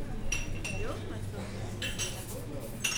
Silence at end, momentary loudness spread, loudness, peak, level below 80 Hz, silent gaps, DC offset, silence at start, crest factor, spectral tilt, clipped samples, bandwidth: 0 s; 6 LU; -37 LUFS; -16 dBFS; -40 dBFS; none; under 0.1%; 0 s; 18 dB; -3 dB/octave; under 0.1%; over 20 kHz